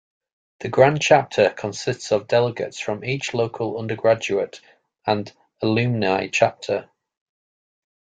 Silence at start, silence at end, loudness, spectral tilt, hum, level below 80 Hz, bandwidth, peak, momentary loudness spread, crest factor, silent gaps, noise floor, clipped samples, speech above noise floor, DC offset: 0.6 s; 1.35 s; -21 LUFS; -5 dB/octave; none; -62 dBFS; 9.4 kHz; -2 dBFS; 10 LU; 20 dB; none; under -90 dBFS; under 0.1%; over 69 dB; under 0.1%